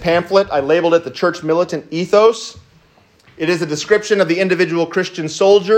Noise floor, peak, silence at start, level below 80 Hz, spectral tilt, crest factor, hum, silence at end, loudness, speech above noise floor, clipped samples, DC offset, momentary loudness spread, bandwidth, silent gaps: -51 dBFS; 0 dBFS; 0 s; -52 dBFS; -5 dB/octave; 14 dB; none; 0 s; -15 LUFS; 37 dB; under 0.1%; under 0.1%; 9 LU; 9.6 kHz; none